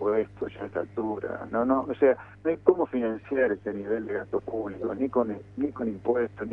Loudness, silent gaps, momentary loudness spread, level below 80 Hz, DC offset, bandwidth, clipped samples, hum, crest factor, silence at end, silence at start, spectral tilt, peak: -28 LUFS; none; 9 LU; -60 dBFS; under 0.1%; 3.9 kHz; under 0.1%; none; 24 dB; 0 s; 0 s; -9.5 dB/octave; -4 dBFS